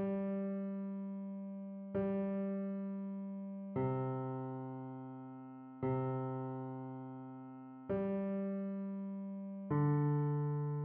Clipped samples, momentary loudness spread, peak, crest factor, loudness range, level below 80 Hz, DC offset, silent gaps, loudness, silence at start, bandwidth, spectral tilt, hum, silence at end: under 0.1%; 13 LU; -24 dBFS; 16 dB; 5 LU; -72 dBFS; under 0.1%; none; -40 LUFS; 0 s; 3.4 kHz; -10.5 dB/octave; none; 0 s